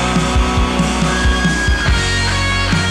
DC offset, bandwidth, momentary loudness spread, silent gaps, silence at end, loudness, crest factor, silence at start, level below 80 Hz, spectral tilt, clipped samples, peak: under 0.1%; 12.5 kHz; 1 LU; none; 0 s; -15 LUFS; 10 dB; 0 s; -20 dBFS; -4.5 dB/octave; under 0.1%; -4 dBFS